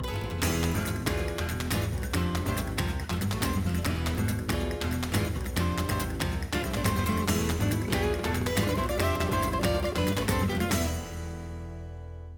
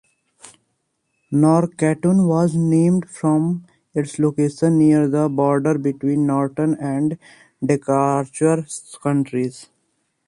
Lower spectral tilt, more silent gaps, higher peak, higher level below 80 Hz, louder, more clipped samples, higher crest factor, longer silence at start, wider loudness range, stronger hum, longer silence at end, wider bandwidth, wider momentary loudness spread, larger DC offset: second, -5 dB/octave vs -8 dB/octave; neither; second, -12 dBFS vs -4 dBFS; first, -36 dBFS vs -60 dBFS; second, -29 LUFS vs -19 LUFS; neither; about the same, 18 dB vs 16 dB; second, 0 s vs 0.45 s; about the same, 2 LU vs 3 LU; neither; second, 0 s vs 0.65 s; first, 19.5 kHz vs 11.5 kHz; second, 5 LU vs 9 LU; neither